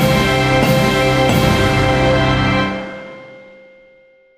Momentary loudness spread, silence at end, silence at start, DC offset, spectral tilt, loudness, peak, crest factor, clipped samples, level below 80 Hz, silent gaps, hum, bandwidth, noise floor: 13 LU; 1 s; 0 s; under 0.1%; -5.5 dB/octave; -14 LUFS; 0 dBFS; 14 dB; under 0.1%; -30 dBFS; none; none; 15.5 kHz; -49 dBFS